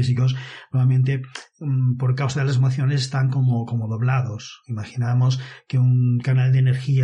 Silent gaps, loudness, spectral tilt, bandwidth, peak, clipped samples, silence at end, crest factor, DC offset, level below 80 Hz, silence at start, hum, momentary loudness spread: none; -21 LUFS; -7 dB/octave; 8.6 kHz; -12 dBFS; under 0.1%; 0 s; 8 dB; under 0.1%; -58 dBFS; 0 s; none; 11 LU